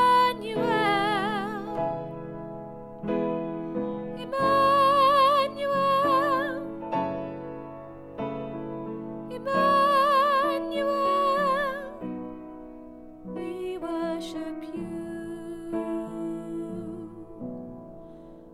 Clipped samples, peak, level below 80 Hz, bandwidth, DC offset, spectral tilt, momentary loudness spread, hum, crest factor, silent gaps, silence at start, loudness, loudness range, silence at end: under 0.1%; -12 dBFS; -56 dBFS; 15.5 kHz; under 0.1%; -5.5 dB/octave; 20 LU; none; 16 dB; none; 0 s; -26 LUFS; 12 LU; 0 s